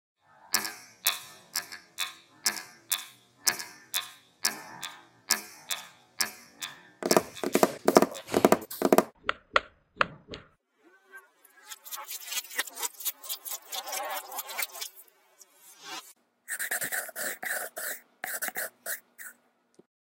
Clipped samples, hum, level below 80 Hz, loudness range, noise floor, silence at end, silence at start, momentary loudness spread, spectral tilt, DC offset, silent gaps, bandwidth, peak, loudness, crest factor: under 0.1%; none; -70 dBFS; 9 LU; -64 dBFS; 0.7 s; 0.45 s; 17 LU; -2 dB/octave; under 0.1%; none; 17 kHz; 0 dBFS; -31 LUFS; 32 dB